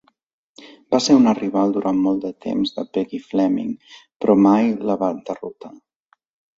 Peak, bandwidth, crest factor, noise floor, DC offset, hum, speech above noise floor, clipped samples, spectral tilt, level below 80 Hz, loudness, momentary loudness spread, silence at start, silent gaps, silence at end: -2 dBFS; 7.8 kHz; 18 dB; -46 dBFS; under 0.1%; none; 27 dB; under 0.1%; -6 dB/octave; -62 dBFS; -19 LUFS; 15 LU; 0.6 s; 4.16-4.20 s; 0.9 s